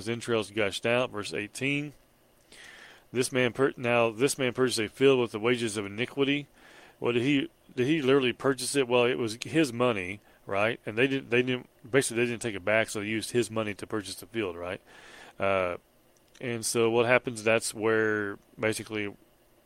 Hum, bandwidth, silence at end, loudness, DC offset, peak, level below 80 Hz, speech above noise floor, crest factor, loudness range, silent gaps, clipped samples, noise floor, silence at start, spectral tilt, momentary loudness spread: none; 16.5 kHz; 0.55 s; -28 LUFS; under 0.1%; -6 dBFS; -66 dBFS; 34 dB; 22 dB; 5 LU; none; under 0.1%; -62 dBFS; 0 s; -4.5 dB/octave; 11 LU